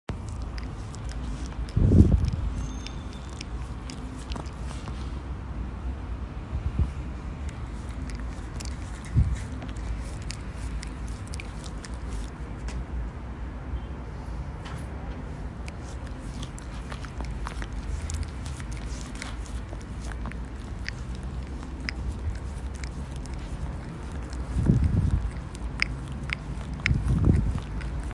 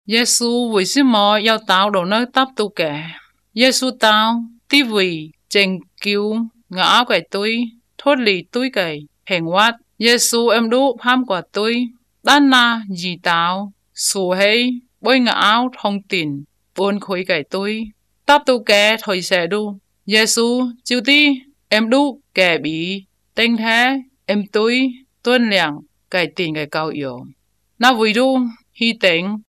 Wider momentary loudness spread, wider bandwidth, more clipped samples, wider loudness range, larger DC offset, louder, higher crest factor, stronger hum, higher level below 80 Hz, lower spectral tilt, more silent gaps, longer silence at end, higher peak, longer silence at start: about the same, 12 LU vs 11 LU; second, 11.5 kHz vs 15.5 kHz; neither; first, 10 LU vs 3 LU; neither; second, -32 LUFS vs -16 LUFS; first, 26 dB vs 16 dB; neither; first, -34 dBFS vs -62 dBFS; first, -6.5 dB/octave vs -3 dB/octave; neither; about the same, 0 s vs 0.1 s; second, -4 dBFS vs 0 dBFS; about the same, 0.1 s vs 0.1 s